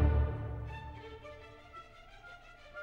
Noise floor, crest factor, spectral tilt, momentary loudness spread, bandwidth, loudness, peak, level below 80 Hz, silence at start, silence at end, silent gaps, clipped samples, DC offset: -54 dBFS; 20 dB; -8.5 dB/octave; 19 LU; 4.8 kHz; -39 LUFS; -16 dBFS; -38 dBFS; 0 s; 0 s; none; under 0.1%; under 0.1%